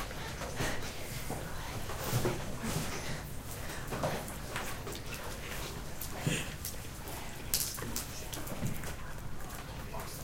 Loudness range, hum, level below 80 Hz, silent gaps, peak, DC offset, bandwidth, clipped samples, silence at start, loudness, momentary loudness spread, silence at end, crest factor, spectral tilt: 2 LU; none; -46 dBFS; none; -8 dBFS; under 0.1%; 17 kHz; under 0.1%; 0 s; -38 LUFS; 9 LU; 0 s; 30 dB; -3.5 dB/octave